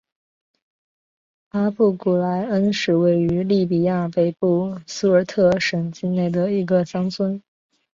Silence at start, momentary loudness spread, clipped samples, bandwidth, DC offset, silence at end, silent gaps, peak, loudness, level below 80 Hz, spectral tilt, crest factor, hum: 1.55 s; 7 LU; under 0.1%; 7.6 kHz; under 0.1%; 0.55 s; none; -4 dBFS; -20 LUFS; -56 dBFS; -7 dB/octave; 16 dB; none